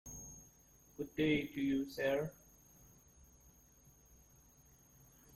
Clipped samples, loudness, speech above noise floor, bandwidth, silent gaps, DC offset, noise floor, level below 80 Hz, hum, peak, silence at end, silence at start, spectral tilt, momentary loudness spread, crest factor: under 0.1%; -38 LUFS; 29 dB; 16.5 kHz; none; under 0.1%; -66 dBFS; -66 dBFS; none; -22 dBFS; 3.05 s; 0.05 s; -5 dB/octave; 27 LU; 20 dB